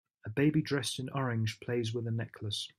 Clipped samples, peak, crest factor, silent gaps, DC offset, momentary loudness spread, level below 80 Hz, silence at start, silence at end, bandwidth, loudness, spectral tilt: under 0.1%; -18 dBFS; 16 dB; none; under 0.1%; 8 LU; -70 dBFS; 0.25 s; 0.1 s; 13.5 kHz; -34 LUFS; -5.5 dB/octave